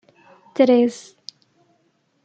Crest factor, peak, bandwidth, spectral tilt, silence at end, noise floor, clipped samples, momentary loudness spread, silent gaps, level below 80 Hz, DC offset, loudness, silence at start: 20 dB; -2 dBFS; 9 kHz; -5 dB/octave; 1.25 s; -65 dBFS; under 0.1%; 25 LU; none; -76 dBFS; under 0.1%; -18 LUFS; 0.6 s